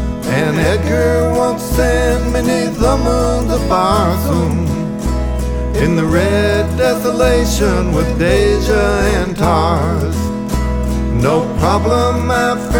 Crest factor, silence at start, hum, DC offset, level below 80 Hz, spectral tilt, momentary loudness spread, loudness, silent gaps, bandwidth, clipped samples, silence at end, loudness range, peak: 14 dB; 0 s; none; under 0.1%; -20 dBFS; -6 dB/octave; 5 LU; -14 LUFS; none; 18.5 kHz; under 0.1%; 0 s; 2 LU; 0 dBFS